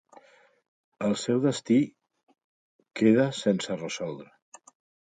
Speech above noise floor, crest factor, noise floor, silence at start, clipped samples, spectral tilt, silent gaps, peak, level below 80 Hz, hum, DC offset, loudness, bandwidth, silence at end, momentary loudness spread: 31 dB; 20 dB; -57 dBFS; 1 s; under 0.1%; -5.5 dB/octave; 2.23-2.27 s, 2.44-2.79 s; -10 dBFS; -72 dBFS; none; under 0.1%; -26 LUFS; 9.4 kHz; 0.9 s; 13 LU